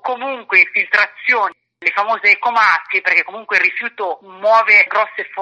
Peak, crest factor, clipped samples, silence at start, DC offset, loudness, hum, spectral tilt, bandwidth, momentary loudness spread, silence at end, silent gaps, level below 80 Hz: 0 dBFS; 16 dB; under 0.1%; 0.05 s; under 0.1%; -14 LUFS; none; -2 dB/octave; 9 kHz; 12 LU; 0 s; none; -80 dBFS